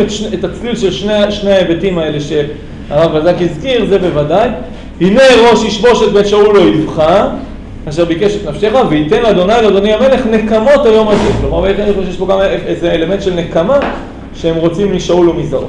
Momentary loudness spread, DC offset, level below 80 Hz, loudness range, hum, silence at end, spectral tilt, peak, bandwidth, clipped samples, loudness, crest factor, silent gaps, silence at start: 10 LU; under 0.1%; -28 dBFS; 4 LU; none; 0 s; -6 dB/octave; 0 dBFS; 10.5 kHz; under 0.1%; -10 LUFS; 10 dB; none; 0 s